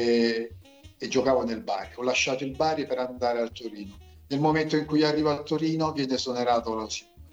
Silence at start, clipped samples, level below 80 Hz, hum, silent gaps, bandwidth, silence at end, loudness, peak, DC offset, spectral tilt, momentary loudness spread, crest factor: 0 s; under 0.1%; -54 dBFS; none; none; 8.2 kHz; 0.05 s; -27 LUFS; -12 dBFS; under 0.1%; -5 dB/octave; 11 LU; 16 dB